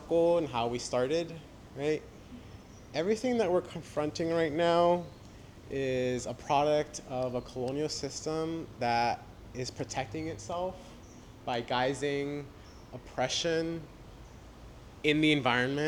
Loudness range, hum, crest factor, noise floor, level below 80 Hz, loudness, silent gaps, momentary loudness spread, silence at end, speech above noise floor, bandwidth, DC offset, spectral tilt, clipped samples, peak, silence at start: 5 LU; none; 20 dB; -51 dBFS; -56 dBFS; -32 LUFS; none; 24 LU; 0 s; 20 dB; 13 kHz; under 0.1%; -4.5 dB/octave; under 0.1%; -12 dBFS; 0 s